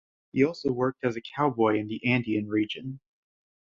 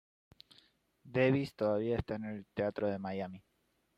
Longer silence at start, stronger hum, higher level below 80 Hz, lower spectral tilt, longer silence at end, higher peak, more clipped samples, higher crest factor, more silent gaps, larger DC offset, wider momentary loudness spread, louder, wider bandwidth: second, 0.35 s vs 1.05 s; neither; about the same, -64 dBFS vs -60 dBFS; about the same, -7.5 dB/octave vs -8 dB/octave; about the same, 0.7 s vs 0.6 s; first, -10 dBFS vs -16 dBFS; neither; about the same, 18 dB vs 20 dB; neither; neither; about the same, 9 LU vs 11 LU; first, -27 LUFS vs -35 LUFS; second, 7.4 kHz vs 12 kHz